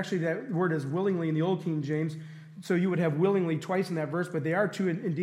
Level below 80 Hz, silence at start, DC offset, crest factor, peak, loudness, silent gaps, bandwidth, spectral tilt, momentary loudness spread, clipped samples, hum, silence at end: -80 dBFS; 0 s; under 0.1%; 16 dB; -12 dBFS; -29 LUFS; none; 12.5 kHz; -7.5 dB/octave; 5 LU; under 0.1%; none; 0 s